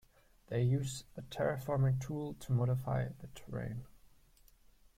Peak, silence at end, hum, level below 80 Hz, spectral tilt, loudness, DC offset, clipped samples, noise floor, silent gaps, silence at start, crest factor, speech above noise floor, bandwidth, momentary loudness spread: -22 dBFS; 1 s; none; -58 dBFS; -7 dB/octave; -37 LUFS; under 0.1%; under 0.1%; -64 dBFS; none; 0.5 s; 14 dB; 29 dB; 15.5 kHz; 13 LU